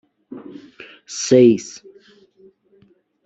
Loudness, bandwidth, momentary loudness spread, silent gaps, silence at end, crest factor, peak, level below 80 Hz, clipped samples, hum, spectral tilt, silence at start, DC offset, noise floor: -15 LUFS; 8 kHz; 28 LU; none; 1.55 s; 20 dB; -2 dBFS; -64 dBFS; under 0.1%; none; -5 dB/octave; 0.3 s; under 0.1%; -57 dBFS